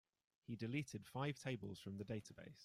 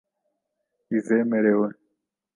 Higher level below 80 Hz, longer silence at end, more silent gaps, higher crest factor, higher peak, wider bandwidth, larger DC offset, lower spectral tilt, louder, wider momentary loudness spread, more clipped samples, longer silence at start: about the same, -78 dBFS vs -76 dBFS; second, 0 s vs 0.65 s; neither; about the same, 18 dB vs 18 dB; second, -32 dBFS vs -8 dBFS; first, 15.5 kHz vs 9.8 kHz; neither; second, -6 dB/octave vs -9.5 dB/octave; second, -48 LUFS vs -23 LUFS; about the same, 9 LU vs 8 LU; neither; second, 0.5 s vs 0.9 s